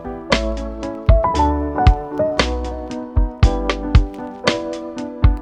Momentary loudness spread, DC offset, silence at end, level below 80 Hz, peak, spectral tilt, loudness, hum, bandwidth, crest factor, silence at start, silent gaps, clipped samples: 11 LU; under 0.1%; 0 s; -20 dBFS; 0 dBFS; -6 dB/octave; -19 LUFS; none; 9.2 kHz; 16 dB; 0 s; none; under 0.1%